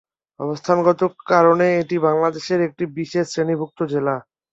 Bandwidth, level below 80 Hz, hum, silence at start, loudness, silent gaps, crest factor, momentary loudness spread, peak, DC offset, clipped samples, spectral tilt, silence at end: 7.8 kHz; -64 dBFS; none; 0.4 s; -19 LUFS; none; 18 dB; 12 LU; -2 dBFS; under 0.1%; under 0.1%; -6.5 dB/octave; 0.3 s